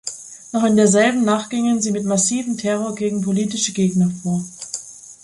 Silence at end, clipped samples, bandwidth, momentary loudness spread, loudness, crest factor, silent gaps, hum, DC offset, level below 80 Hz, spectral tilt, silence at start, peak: 0.1 s; under 0.1%; 11.5 kHz; 15 LU; -19 LUFS; 16 dB; none; none; under 0.1%; -60 dBFS; -4.5 dB/octave; 0.05 s; -2 dBFS